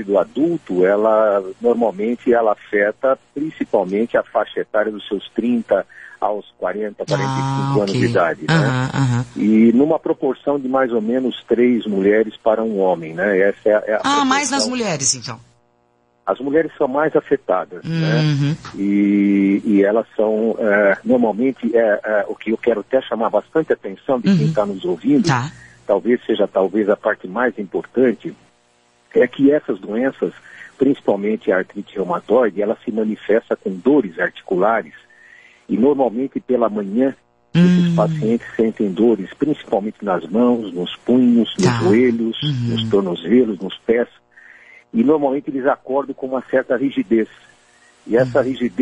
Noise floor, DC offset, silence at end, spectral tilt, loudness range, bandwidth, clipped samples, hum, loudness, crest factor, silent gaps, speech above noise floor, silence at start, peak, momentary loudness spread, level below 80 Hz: -60 dBFS; under 0.1%; 0 s; -6 dB/octave; 3 LU; 10.5 kHz; under 0.1%; none; -18 LUFS; 14 dB; none; 43 dB; 0 s; -4 dBFS; 8 LU; -56 dBFS